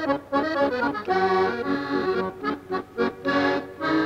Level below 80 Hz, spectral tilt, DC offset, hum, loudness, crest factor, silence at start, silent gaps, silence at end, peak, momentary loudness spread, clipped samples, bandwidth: -58 dBFS; -6 dB/octave; under 0.1%; none; -25 LUFS; 14 dB; 0 s; none; 0 s; -10 dBFS; 6 LU; under 0.1%; 8.8 kHz